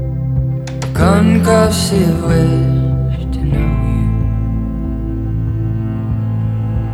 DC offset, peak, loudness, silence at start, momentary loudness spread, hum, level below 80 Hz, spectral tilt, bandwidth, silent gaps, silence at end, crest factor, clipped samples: under 0.1%; 0 dBFS; -15 LUFS; 0 s; 9 LU; none; -22 dBFS; -7 dB/octave; 13.5 kHz; none; 0 s; 14 dB; under 0.1%